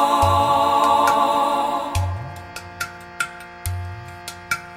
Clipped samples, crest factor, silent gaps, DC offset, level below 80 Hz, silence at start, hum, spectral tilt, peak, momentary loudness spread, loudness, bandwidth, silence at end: under 0.1%; 18 dB; none; under 0.1%; -40 dBFS; 0 s; none; -4.5 dB/octave; -4 dBFS; 18 LU; -20 LUFS; 16.5 kHz; 0 s